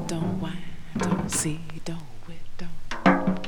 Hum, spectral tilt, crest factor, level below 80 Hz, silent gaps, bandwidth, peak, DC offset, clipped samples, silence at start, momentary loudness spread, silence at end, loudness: none; -5 dB/octave; 22 dB; -40 dBFS; none; 19 kHz; -4 dBFS; under 0.1%; under 0.1%; 0 s; 20 LU; 0 s; -27 LUFS